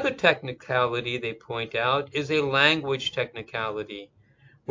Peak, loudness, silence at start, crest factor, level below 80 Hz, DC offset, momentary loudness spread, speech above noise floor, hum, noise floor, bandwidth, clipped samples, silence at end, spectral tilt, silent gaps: -2 dBFS; -25 LUFS; 0 s; 24 dB; -62 dBFS; under 0.1%; 13 LU; 31 dB; none; -58 dBFS; 7.6 kHz; under 0.1%; 0.65 s; -4.5 dB/octave; none